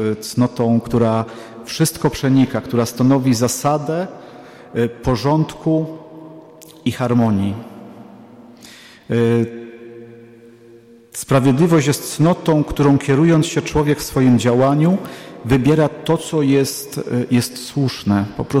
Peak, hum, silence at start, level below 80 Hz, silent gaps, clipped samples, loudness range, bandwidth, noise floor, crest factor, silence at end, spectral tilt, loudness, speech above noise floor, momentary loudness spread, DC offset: -6 dBFS; none; 0 s; -42 dBFS; none; under 0.1%; 7 LU; 16 kHz; -44 dBFS; 12 dB; 0 s; -6 dB/octave; -17 LUFS; 28 dB; 15 LU; under 0.1%